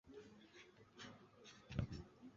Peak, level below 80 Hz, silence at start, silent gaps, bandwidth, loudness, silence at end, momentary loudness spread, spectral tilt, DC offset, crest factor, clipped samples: -28 dBFS; -62 dBFS; 0.05 s; none; 7.4 kHz; -54 LUFS; 0 s; 16 LU; -6 dB/octave; under 0.1%; 26 dB; under 0.1%